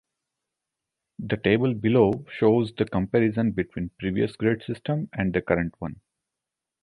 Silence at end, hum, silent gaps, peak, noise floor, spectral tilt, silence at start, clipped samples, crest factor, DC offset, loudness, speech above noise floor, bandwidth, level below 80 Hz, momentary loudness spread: 0.9 s; none; none; -6 dBFS; -87 dBFS; -9 dB/octave; 1.2 s; under 0.1%; 20 dB; under 0.1%; -25 LUFS; 63 dB; 11 kHz; -50 dBFS; 10 LU